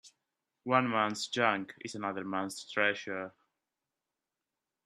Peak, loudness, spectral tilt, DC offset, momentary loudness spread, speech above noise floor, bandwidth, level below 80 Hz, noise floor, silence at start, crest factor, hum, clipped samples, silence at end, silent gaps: -10 dBFS; -32 LUFS; -4 dB/octave; under 0.1%; 12 LU; 57 dB; 14 kHz; -80 dBFS; -89 dBFS; 0.05 s; 24 dB; none; under 0.1%; 1.55 s; none